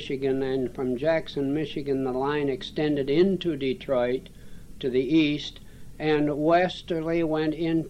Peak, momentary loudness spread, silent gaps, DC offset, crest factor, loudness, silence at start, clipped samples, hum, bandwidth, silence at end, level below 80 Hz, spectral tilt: -10 dBFS; 7 LU; none; 0.2%; 16 dB; -26 LUFS; 0 s; under 0.1%; none; 12 kHz; 0 s; -48 dBFS; -7 dB/octave